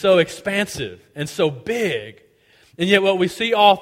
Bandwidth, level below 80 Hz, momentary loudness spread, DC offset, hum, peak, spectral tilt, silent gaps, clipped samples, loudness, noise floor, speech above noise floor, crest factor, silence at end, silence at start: 16.5 kHz; -56 dBFS; 14 LU; under 0.1%; none; 0 dBFS; -4.5 dB/octave; none; under 0.1%; -20 LUFS; -55 dBFS; 36 dB; 20 dB; 0 s; 0 s